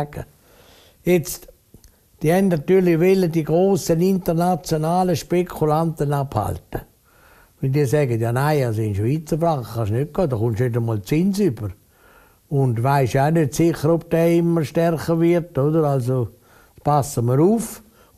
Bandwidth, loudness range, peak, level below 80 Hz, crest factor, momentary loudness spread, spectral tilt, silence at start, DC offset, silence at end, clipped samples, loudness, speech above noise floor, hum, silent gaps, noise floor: 15 kHz; 4 LU; -4 dBFS; -46 dBFS; 16 dB; 10 LU; -7 dB/octave; 0 s; under 0.1%; 0.4 s; under 0.1%; -20 LUFS; 34 dB; none; none; -53 dBFS